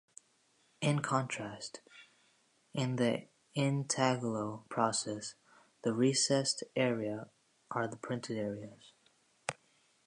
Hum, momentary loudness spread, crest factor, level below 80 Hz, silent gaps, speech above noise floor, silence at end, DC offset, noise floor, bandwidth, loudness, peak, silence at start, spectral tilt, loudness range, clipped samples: none; 14 LU; 22 dB; -78 dBFS; none; 38 dB; 0.55 s; under 0.1%; -72 dBFS; 11 kHz; -35 LUFS; -14 dBFS; 0.8 s; -4.5 dB/octave; 5 LU; under 0.1%